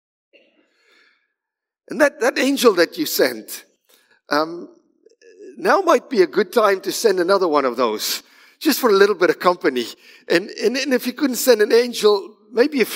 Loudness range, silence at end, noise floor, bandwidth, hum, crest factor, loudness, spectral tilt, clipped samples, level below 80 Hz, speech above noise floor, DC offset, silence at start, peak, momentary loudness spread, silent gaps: 4 LU; 0 s; -85 dBFS; 16.5 kHz; none; 18 dB; -18 LUFS; -3 dB/octave; under 0.1%; -76 dBFS; 67 dB; under 0.1%; 1.9 s; 0 dBFS; 10 LU; none